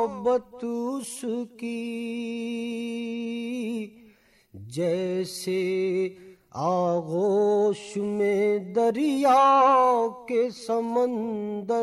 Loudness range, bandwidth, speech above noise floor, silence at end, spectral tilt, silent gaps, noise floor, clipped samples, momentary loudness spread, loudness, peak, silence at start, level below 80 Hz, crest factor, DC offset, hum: 10 LU; 13.5 kHz; 33 dB; 0 s; -5.5 dB/octave; none; -58 dBFS; under 0.1%; 12 LU; -25 LUFS; -12 dBFS; 0 s; -70 dBFS; 14 dB; under 0.1%; none